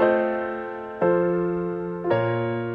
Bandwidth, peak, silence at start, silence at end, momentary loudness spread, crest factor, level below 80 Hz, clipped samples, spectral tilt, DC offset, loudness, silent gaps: 4.8 kHz; -6 dBFS; 0 s; 0 s; 8 LU; 18 dB; -56 dBFS; under 0.1%; -10 dB/octave; under 0.1%; -24 LUFS; none